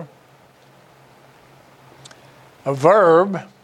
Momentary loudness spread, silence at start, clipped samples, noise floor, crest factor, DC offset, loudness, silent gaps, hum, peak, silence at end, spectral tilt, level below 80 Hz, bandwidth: 14 LU; 0 s; under 0.1%; -51 dBFS; 20 dB; under 0.1%; -16 LUFS; none; none; 0 dBFS; 0.2 s; -7 dB/octave; -70 dBFS; 11.5 kHz